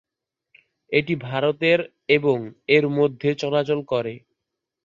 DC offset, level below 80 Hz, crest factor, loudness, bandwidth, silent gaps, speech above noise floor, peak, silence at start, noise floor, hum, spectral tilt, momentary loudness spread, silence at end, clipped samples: under 0.1%; -64 dBFS; 20 dB; -22 LUFS; 7.4 kHz; none; 64 dB; -4 dBFS; 0.9 s; -85 dBFS; none; -6.5 dB/octave; 7 LU; 0.7 s; under 0.1%